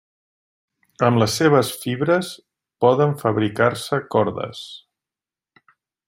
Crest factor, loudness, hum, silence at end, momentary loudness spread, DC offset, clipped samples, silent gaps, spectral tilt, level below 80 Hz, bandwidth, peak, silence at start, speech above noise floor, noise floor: 20 dB; -20 LUFS; none; 1.3 s; 15 LU; under 0.1%; under 0.1%; none; -5.5 dB/octave; -60 dBFS; 16.5 kHz; -2 dBFS; 1 s; over 71 dB; under -90 dBFS